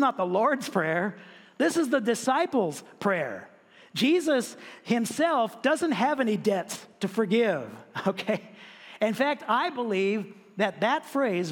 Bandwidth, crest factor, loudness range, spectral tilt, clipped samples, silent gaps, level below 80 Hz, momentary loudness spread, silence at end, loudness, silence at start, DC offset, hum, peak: 17 kHz; 18 dB; 2 LU; -4.5 dB/octave; under 0.1%; none; -78 dBFS; 11 LU; 0 s; -27 LUFS; 0 s; under 0.1%; none; -10 dBFS